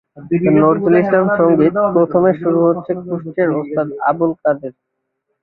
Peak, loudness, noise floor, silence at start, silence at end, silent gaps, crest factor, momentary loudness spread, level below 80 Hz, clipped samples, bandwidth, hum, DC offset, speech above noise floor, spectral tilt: -2 dBFS; -15 LUFS; -72 dBFS; 0.15 s; 0.7 s; none; 14 dB; 9 LU; -54 dBFS; under 0.1%; 4.1 kHz; none; under 0.1%; 57 dB; -12 dB/octave